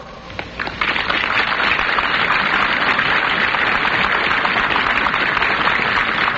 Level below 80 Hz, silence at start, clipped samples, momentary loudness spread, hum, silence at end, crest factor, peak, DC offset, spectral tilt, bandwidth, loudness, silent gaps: -42 dBFS; 0 s; under 0.1%; 4 LU; none; 0 s; 14 dB; -2 dBFS; under 0.1%; 0 dB/octave; 8 kHz; -16 LUFS; none